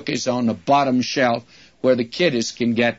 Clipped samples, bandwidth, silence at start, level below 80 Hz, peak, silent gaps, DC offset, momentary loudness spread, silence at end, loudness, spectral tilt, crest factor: under 0.1%; 8 kHz; 0 s; -62 dBFS; -4 dBFS; none; 0.1%; 5 LU; 0.05 s; -20 LUFS; -4.5 dB/octave; 16 dB